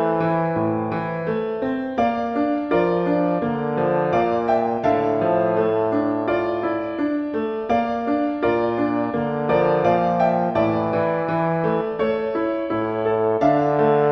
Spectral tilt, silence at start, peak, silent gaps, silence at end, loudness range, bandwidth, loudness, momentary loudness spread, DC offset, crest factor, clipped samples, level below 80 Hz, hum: -9 dB/octave; 0 s; -6 dBFS; none; 0 s; 2 LU; 6.2 kHz; -21 LUFS; 6 LU; under 0.1%; 14 dB; under 0.1%; -52 dBFS; none